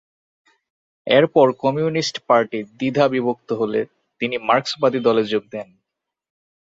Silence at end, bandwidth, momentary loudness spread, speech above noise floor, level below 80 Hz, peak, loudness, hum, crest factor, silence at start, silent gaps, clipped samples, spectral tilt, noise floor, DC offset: 1.05 s; 7.8 kHz; 11 LU; 63 dB; -64 dBFS; -2 dBFS; -19 LUFS; none; 18 dB; 1.05 s; none; under 0.1%; -5.5 dB/octave; -82 dBFS; under 0.1%